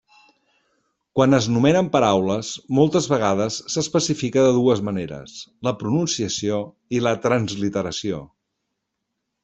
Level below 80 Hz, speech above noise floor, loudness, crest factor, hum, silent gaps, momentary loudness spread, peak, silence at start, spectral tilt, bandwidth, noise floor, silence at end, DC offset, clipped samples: -56 dBFS; 58 dB; -21 LUFS; 18 dB; none; none; 10 LU; -2 dBFS; 1.15 s; -5 dB/octave; 8.4 kHz; -79 dBFS; 1.2 s; under 0.1%; under 0.1%